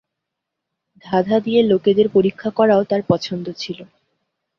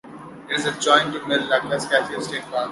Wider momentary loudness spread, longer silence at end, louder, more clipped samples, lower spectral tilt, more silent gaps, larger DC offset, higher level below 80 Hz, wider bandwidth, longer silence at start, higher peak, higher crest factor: about the same, 13 LU vs 11 LU; first, 0.75 s vs 0 s; first, -17 LUFS vs -21 LUFS; neither; first, -7 dB/octave vs -3 dB/octave; neither; neither; about the same, -58 dBFS vs -62 dBFS; second, 7 kHz vs 11.5 kHz; first, 1.05 s vs 0.05 s; about the same, -2 dBFS vs -2 dBFS; about the same, 18 dB vs 20 dB